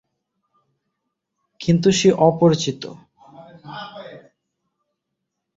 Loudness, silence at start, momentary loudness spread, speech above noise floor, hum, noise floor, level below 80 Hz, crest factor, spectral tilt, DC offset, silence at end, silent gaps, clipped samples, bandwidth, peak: -17 LUFS; 1.6 s; 22 LU; 62 dB; none; -79 dBFS; -58 dBFS; 20 dB; -5.5 dB/octave; under 0.1%; 1.4 s; none; under 0.1%; 8 kHz; -2 dBFS